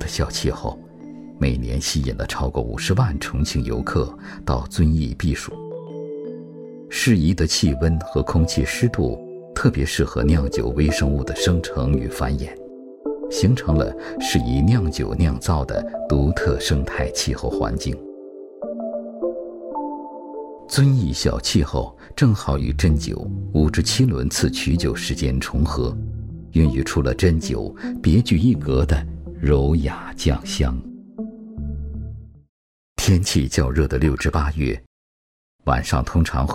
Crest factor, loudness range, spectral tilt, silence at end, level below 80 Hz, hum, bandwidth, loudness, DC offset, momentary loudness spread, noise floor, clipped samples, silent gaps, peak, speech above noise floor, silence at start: 18 dB; 4 LU; -5.5 dB/octave; 0 s; -28 dBFS; none; 16 kHz; -21 LUFS; under 0.1%; 15 LU; under -90 dBFS; under 0.1%; 32.49-32.96 s, 34.86-35.59 s; -4 dBFS; over 70 dB; 0 s